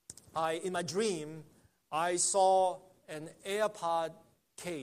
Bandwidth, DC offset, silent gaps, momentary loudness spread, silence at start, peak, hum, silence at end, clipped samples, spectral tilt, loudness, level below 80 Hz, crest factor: 15 kHz; under 0.1%; none; 18 LU; 0.1 s; -16 dBFS; none; 0 s; under 0.1%; -3 dB/octave; -33 LUFS; -76 dBFS; 18 dB